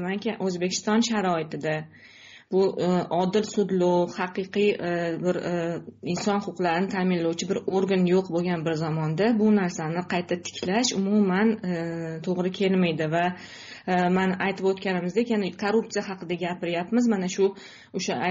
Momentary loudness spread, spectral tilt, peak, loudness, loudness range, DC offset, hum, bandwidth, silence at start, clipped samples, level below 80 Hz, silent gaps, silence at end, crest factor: 8 LU; -5 dB/octave; -10 dBFS; -25 LUFS; 2 LU; under 0.1%; none; 7.6 kHz; 0 s; under 0.1%; -66 dBFS; none; 0 s; 14 dB